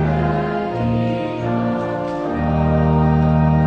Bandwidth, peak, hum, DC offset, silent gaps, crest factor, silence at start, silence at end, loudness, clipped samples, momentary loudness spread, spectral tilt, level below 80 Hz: 6 kHz; -6 dBFS; none; under 0.1%; none; 12 dB; 0 s; 0 s; -19 LUFS; under 0.1%; 7 LU; -9.5 dB/octave; -30 dBFS